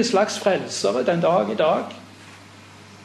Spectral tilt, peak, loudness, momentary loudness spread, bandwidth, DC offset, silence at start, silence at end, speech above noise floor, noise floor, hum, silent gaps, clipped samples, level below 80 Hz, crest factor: -4.5 dB/octave; -6 dBFS; -21 LUFS; 7 LU; 12.5 kHz; under 0.1%; 0 s; 0 s; 24 dB; -45 dBFS; none; none; under 0.1%; -70 dBFS; 16 dB